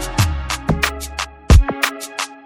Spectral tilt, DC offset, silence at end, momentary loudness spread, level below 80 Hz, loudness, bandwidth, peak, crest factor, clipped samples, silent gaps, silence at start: -4.5 dB/octave; under 0.1%; 0.05 s; 12 LU; -20 dBFS; -18 LUFS; 17 kHz; 0 dBFS; 18 dB; under 0.1%; none; 0 s